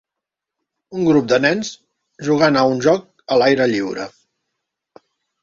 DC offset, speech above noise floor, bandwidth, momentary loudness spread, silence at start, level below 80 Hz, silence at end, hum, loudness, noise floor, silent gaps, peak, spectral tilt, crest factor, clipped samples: under 0.1%; 68 dB; 7.6 kHz; 15 LU; 0.9 s; -60 dBFS; 1.35 s; none; -17 LUFS; -84 dBFS; none; -2 dBFS; -5.5 dB/octave; 18 dB; under 0.1%